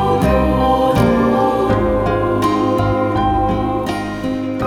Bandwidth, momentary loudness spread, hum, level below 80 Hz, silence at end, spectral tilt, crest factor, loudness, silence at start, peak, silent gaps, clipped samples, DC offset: 17.5 kHz; 7 LU; none; -28 dBFS; 0 s; -7.5 dB/octave; 14 dB; -16 LUFS; 0 s; -2 dBFS; none; under 0.1%; under 0.1%